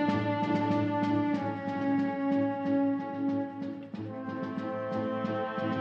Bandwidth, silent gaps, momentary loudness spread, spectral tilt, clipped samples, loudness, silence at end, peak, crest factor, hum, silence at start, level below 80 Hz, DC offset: 6.8 kHz; none; 9 LU; -8.5 dB/octave; under 0.1%; -31 LUFS; 0 s; -16 dBFS; 16 dB; none; 0 s; -74 dBFS; under 0.1%